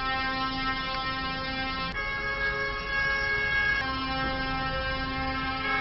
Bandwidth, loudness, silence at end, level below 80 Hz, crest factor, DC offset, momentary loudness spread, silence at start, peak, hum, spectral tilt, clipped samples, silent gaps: 6 kHz; -28 LUFS; 0 s; -40 dBFS; 14 dB; under 0.1%; 5 LU; 0 s; -16 dBFS; none; -1.5 dB/octave; under 0.1%; none